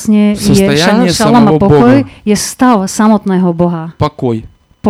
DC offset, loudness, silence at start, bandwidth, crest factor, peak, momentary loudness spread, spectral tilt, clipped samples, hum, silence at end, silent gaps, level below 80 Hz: under 0.1%; -9 LUFS; 0 s; 15 kHz; 8 dB; 0 dBFS; 9 LU; -5.5 dB/octave; 2%; none; 0 s; none; -36 dBFS